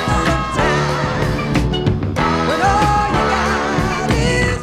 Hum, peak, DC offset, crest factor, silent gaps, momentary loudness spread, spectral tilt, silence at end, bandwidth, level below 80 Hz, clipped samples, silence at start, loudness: none; -2 dBFS; under 0.1%; 14 dB; none; 4 LU; -5.5 dB/octave; 0 s; 15.5 kHz; -26 dBFS; under 0.1%; 0 s; -16 LUFS